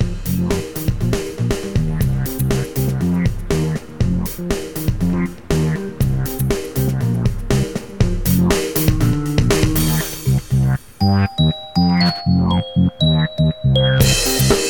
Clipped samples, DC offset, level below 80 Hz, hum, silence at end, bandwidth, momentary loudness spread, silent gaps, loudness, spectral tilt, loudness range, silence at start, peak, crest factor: under 0.1%; 0.7%; -28 dBFS; none; 0 s; over 20 kHz; 6 LU; none; -18 LUFS; -5.5 dB/octave; 4 LU; 0 s; -2 dBFS; 16 dB